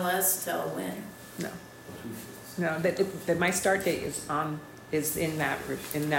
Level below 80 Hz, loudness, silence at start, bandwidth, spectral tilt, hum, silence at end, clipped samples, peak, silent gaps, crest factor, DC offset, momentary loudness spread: -60 dBFS; -30 LUFS; 0 s; 16.5 kHz; -4 dB/octave; none; 0 s; under 0.1%; -14 dBFS; none; 18 dB; under 0.1%; 16 LU